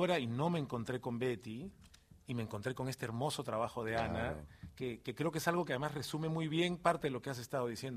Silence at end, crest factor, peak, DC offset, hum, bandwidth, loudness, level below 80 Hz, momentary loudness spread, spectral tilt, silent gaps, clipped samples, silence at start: 0 s; 22 dB; -16 dBFS; under 0.1%; none; 15.5 kHz; -38 LUFS; -62 dBFS; 10 LU; -5.5 dB/octave; none; under 0.1%; 0 s